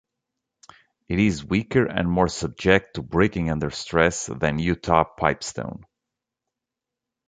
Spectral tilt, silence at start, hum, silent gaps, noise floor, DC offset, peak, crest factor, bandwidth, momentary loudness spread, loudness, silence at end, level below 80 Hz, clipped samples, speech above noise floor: -5.5 dB/octave; 1.1 s; none; none; -86 dBFS; under 0.1%; -2 dBFS; 22 dB; 9.4 kHz; 9 LU; -23 LUFS; 1.45 s; -42 dBFS; under 0.1%; 64 dB